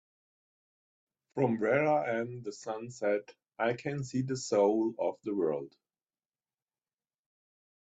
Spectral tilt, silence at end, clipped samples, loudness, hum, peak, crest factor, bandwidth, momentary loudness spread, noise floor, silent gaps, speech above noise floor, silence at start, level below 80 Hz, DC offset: -6 dB/octave; 2.15 s; under 0.1%; -32 LUFS; none; -14 dBFS; 20 dB; 9 kHz; 12 LU; under -90 dBFS; none; over 59 dB; 1.35 s; -76 dBFS; under 0.1%